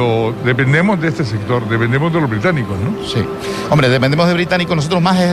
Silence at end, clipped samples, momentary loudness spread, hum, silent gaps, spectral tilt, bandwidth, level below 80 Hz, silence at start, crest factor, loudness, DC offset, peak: 0 s; under 0.1%; 7 LU; none; none; -6.5 dB/octave; 13.5 kHz; -42 dBFS; 0 s; 12 dB; -15 LUFS; under 0.1%; -2 dBFS